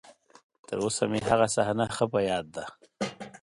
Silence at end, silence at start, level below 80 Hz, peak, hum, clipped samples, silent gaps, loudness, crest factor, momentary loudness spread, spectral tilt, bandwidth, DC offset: 0.05 s; 0.05 s; -58 dBFS; -10 dBFS; none; under 0.1%; 0.43-0.50 s, 0.59-0.63 s; -28 LUFS; 20 dB; 14 LU; -4.5 dB/octave; 11.5 kHz; under 0.1%